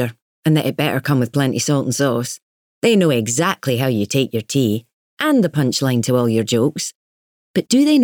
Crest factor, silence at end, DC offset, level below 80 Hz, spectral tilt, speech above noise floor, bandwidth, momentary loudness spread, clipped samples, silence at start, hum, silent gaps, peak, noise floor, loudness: 14 dB; 0 s; under 0.1%; -62 dBFS; -5 dB/octave; over 73 dB; 19 kHz; 8 LU; under 0.1%; 0 s; none; 0.22-0.43 s, 2.42-2.82 s, 4.93-5.17 s, 6.95-7.54 s; -4 dBFS; under -90 dBFS; -18 LUFS